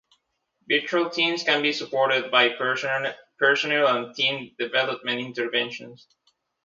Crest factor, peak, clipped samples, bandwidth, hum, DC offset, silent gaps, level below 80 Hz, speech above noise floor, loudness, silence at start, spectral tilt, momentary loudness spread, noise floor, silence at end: 22 dB; -2 dBFS; under 0.1%; 7.6 kHz; none; under 0.1%; none; -78 dBFS; 49 dB; -23 LUFS; 0.7 s; -3.5 dB/octave; 8 LU; -73 dBFS; 0.7 s